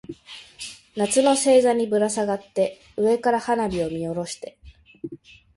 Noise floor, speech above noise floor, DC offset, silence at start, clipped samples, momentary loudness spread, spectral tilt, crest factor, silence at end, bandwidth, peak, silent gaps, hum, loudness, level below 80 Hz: -43 dBFS; 22 dB; under 0.1%; 0.1 s; under 0.1%; 21 LU; -4 dB/octave; 18 dB; 0.4 s; 11.5 kHz; -6 dBFS; none; none; -22 LUFS; -56 dBFS